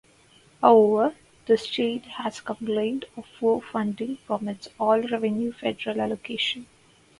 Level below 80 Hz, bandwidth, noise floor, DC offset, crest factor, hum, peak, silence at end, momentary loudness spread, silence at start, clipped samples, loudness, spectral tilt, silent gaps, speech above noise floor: -66 dBFS; 11.5 kHz; -57 dBFS; under 0.1%; 22 dB; none; -2 dBFS; 0.55 s; 14 LU; 0.6 s; under 0.1%; -25 LUFS; -5.5 dB/octave; none; 32 dB